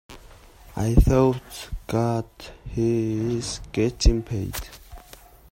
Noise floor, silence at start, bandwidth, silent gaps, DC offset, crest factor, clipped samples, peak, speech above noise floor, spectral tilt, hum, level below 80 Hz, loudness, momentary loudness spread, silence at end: -48 dBFS; 0.1 s; 16.5 kHz; none; under 0.1%; 22 dB; under 0.1%; -2 dBFS; 26 dB; -6.5 dB/octave; none; -30 dBFS; -24 LUFS; 20 LU; 0.55 s